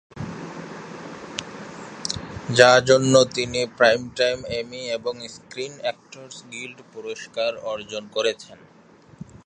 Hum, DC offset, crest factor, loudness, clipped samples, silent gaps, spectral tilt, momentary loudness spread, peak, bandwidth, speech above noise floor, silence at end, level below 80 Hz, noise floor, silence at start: none; under 0.1%; 24 dB; -21 LUFS; under 0.1%; none; -3.5 dB/octave; 21 LU; 0 dBFS; 10.5 kHz; 28 dB; 0.1 s; -56 dBFS; -50 dBFS; 0.15 s